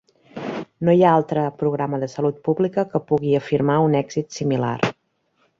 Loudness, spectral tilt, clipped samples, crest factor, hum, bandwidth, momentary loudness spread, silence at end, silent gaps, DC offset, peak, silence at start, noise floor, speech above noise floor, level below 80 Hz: -21 LUFS; -7.5 dB/octave; under 0.1%; 18 dB; none; 7.6 kHz; 11 LU; 0.7 s; none; under 0.1%; -4 dBFS; 0.35 s; -67 dBFS; 47 dB; -60 dBFS